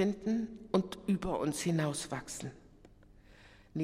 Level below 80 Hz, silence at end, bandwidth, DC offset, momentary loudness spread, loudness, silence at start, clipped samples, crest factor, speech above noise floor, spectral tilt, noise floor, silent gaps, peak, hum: -58 dBFS; 0 s; 15.5 kHz; under 0.1%; 11 LU; -35 LUFS; 0 s; under 0.1%; 20 dB; 25 dB; -5.5 dB/octave; -59 dBFS; none; -16 dBFS; none